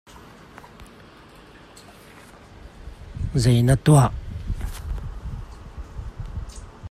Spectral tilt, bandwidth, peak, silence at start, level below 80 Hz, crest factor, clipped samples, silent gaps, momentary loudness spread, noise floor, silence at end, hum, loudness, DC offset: -6.5 dB/octave; 14.5 kHz; -6 dBFS; 0.1 s; -36 dBFS; 20 dB; under 0.1%; none; 28 LU; -47 dBFS; 0 s; none; -22 LUFS; under 0.1%